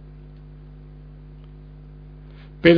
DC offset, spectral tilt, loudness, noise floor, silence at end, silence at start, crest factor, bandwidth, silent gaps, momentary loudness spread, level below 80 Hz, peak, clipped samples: under 0.1%; -5 dB/octave; -19 LUFS; -42 dBFS; 0 s; 2.65 s; 24 dB; 5.4 kHz; none; 0 LU; -44 dBFS; -2 dBFS; under 0.1%